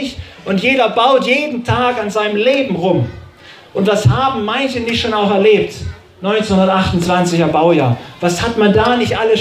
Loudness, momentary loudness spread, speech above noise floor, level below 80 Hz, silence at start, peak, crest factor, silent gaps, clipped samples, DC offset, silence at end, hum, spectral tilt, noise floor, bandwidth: -14 LUFS; 7 LU; 25 dB; -36 dBFS; 0 s; 0 dBFS; 14 dB; none; under 0.1%; under 0.1%; 0 s; none; -5.5 dB/octave; -39 dBFS; 15 kHz